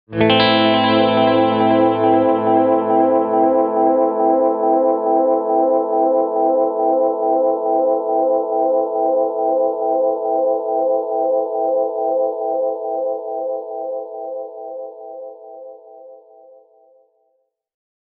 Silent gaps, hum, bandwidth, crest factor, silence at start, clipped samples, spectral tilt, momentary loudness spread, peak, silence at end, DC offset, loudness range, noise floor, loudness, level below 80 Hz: none; none; 5.2 kHz; 18 dB; 0.1 s; under 0.1%; -3.5 dB/octave; 14 LU; 0 dBFS; 2 s; under 0.1%; 14 LU; -67 dBFS; -17 LUFS; -60 dBFS